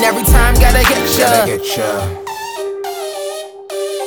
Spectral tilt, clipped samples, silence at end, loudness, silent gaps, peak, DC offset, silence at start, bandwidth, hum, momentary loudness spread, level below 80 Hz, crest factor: -4 dB/octave; under 0.1%; 0 s; -14 LUFS; none; 0 dBFS; under 0.1%; 0 s; over 20 kHz; none; 14 LU; -18 dBFS; 14 dB